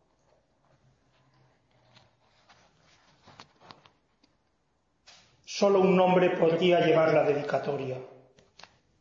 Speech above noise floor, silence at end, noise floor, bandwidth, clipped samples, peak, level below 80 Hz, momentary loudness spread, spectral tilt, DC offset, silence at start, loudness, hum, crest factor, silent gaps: 50 dB; 0.95 s; -74 dBFS; 7.4 kHz; under 0.1%; -10 dBFS; -72 dBFS; 13 LU; -6 dB/octave; under 0.1%; 5.5 s; -25 LUFS; none; 18 dB; none